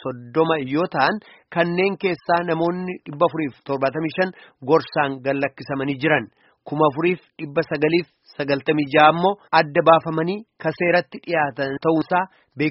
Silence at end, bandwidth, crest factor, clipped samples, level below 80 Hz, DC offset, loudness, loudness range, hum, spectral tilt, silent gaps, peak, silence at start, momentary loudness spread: 0 s; 6 kHz; 20 dB; under 0.1%; -62 dBFS; under 0.1%; -21 LUFS; 4 LU; none; -4 dB/octave; none; 0 dBFS; 0.05 s; 11 LU